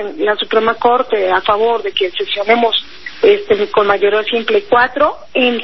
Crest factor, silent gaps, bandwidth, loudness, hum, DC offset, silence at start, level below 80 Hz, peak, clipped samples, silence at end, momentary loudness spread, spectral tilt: 14 dB; none; 6 kHz; -14 LUFS; none; 2%; 0 s; -52 dBFS; 0 dBFS; under 0.1%; 0 s; 5 LU; -5 dB/octave